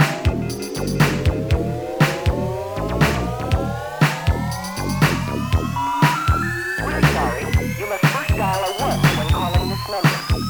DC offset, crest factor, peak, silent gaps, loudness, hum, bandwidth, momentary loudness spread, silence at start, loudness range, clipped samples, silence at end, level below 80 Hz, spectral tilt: under 0.1%; 18 dB; -2 dBFS; none; -20 LUFS; none; over 20 kHz; 7 LU; 0 s; 2 LU; under 0.1%; 0 s; -30 dBFS; -5.5 dB/octave